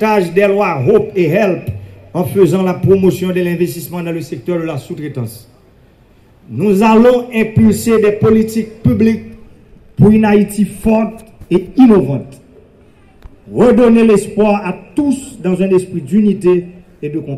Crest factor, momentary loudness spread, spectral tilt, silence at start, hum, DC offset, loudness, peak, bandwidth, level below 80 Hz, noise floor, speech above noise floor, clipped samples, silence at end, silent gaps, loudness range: 12 dB; 14 LU; -7.5 dB/octave; 0 s; none; under 0.1%; -12 LUFS; 0 dBFS; 14.5 kHz; -40 dBFS; -46 dBFS; 34 dB; under 0.1%; 0 s; none; 4 LU